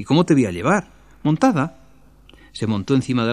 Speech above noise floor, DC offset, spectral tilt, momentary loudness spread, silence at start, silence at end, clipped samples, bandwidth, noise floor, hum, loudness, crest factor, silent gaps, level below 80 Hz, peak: 32 dB; 0.3%; -6.5 dB/octave; 11 LU; 0 s; 0 s; under 0.1%; 11 kHz; -50 dBFS; none; -20 LUFS; 18 dB; none; -52 dBFS; -2 dBFS